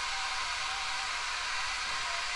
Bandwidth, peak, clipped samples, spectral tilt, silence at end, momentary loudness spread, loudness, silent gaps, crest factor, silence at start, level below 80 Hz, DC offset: 11.5 kHz; -20 dBFS; under 0.1%; 1.5 dB/octave; 0 s; 0 LU; -32 LUFS; none; 14 dB; 0 s; -54 dBFS; under 0.1%